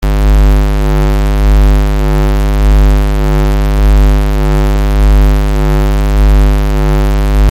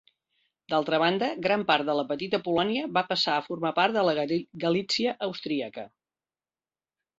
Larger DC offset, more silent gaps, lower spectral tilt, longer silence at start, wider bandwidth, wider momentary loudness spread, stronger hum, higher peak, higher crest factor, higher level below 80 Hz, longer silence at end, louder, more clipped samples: neither; neither; first, -7 dB/octave vs -5 dB/octave; second, 0 s vs 0.7 s; first, 15.5 kHz vs 7.8 kHz; second, 3 LU vs 8 LU; first, 50 Hz at -10 dBFS vs none; first, -2 dBFS vs -6 dBFS; second, 6 dB vs 22 dB; first, -8 dBFS vs -70 dBFS; second, 0 s vs 1.35 s; first, -11 LUFS vs -27 LUFS; neither